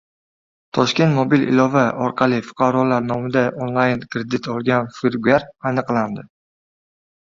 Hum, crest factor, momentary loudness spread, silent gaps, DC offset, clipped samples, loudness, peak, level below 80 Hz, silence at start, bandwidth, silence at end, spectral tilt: none; 18 dB; 8 LU; none; under 0.1%; under 0.1%; -19 LUFS; -2 dBFS; -56 dBFS; 0.75 s; 7.4 kHz; 1.05 s; -6.5 dB/octave